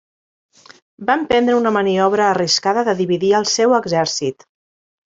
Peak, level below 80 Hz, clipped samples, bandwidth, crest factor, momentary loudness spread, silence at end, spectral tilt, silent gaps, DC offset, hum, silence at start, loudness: -2 dBFS; -56 dBFS; under 0.1%; 8 kHz; 16 dB; 5 LU; 0.75 s; -3.5 dB/octave; none; under 0.1%; none; 1 s; -16 LUFS